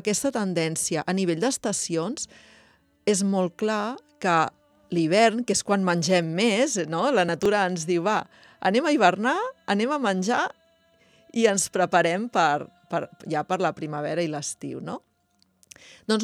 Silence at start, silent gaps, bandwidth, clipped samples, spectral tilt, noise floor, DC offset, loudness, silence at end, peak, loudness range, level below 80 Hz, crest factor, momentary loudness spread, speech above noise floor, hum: 0.05 s; none; 14.5 kHz; under 0.1%; -4 dB/octave; -67 dBFS; under 0.1%; -24 LUFS; 0 s; -6 dBFS; 4 LU; -68 dBFS; 20 dB; 10 LU; 43 dB; none